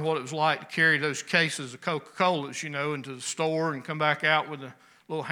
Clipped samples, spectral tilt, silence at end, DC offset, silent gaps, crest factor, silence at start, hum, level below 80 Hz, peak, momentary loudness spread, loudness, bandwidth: under 0.1%; -3.5 dB/octave; 0 s; under 0.1%; none; 22 dB; 0 s; none; -82 dBFS; -6 dBFS; 11 LU; -27 LUFS; 17 kHz